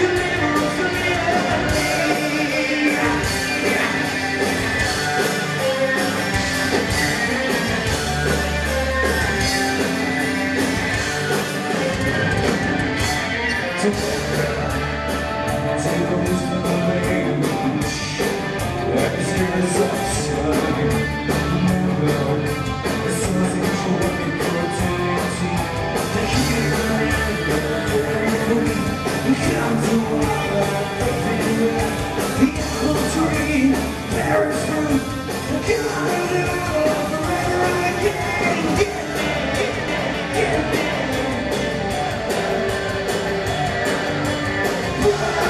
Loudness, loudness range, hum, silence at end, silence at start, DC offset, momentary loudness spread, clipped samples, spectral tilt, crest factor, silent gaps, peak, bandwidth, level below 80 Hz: -20 LUFS; 2 LU; none; 0 s; 0 s; under 0.1%; 3 LU; under 0.1%; -4.5 dB/octave; 18 dB; none; -2 dBFS; 14 kHz; -36 dBFS